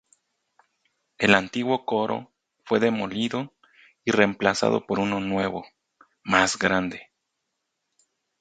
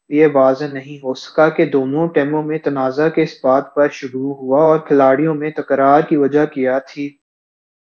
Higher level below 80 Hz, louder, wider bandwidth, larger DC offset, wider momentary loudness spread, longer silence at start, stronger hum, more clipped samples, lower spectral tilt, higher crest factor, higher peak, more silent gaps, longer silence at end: first, -60 dBFS vs -68 dBFS; second, -24 LUFS vs -15 LUFS; first, 9.4 kHz vs 7 kHz; neither; about the same, 13 LU vs 11 LU; first, 1.2 s vs 0.1 s; neither; neither; second, -4.5 dB/octave vs -7.5 dB/octave; first, 26 dB vs 16 dB; about the same, 0 dBFS vs 0 dBFS; neither; first, 1.35 s vs 0.75 s